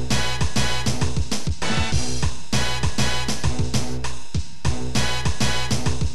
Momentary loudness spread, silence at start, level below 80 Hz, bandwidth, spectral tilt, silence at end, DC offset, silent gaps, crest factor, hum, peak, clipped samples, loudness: 5 LU; 0 s; -32 dBFS; 13.5 kHz; -4 dB/octave; 0 s; 10%; none; 14 dB; none; -8 dBFS; under 0.1%; -24 LUFS